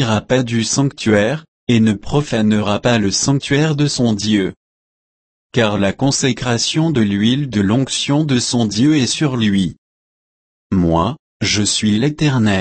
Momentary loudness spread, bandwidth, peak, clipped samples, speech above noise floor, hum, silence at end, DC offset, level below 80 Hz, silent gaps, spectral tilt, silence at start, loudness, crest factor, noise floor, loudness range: 4 LU; 8.8 kHz; -2 dBFS; under 0.1%; over 75 dB; none; 0 s; under 0.1%; -42 dBFS; 1.48-1.67 s, 4.56-5.50 s, 9.78-10.70 s, 11.19-11.40 s; -5 dB/octave; 0 s; -16 LUFS; 14 dB; under -90 dBFS; 2 LU